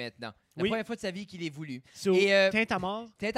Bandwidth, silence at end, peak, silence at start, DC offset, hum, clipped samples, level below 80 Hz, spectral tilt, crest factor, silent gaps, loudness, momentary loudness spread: 13.5 kHz; 0 s; -12 dBFS; 0 s; under 0.1%; none; under 0.1%; -64 dBFS; -5 dB/octave; 18 dB; none; -28 LUFS; 18 LU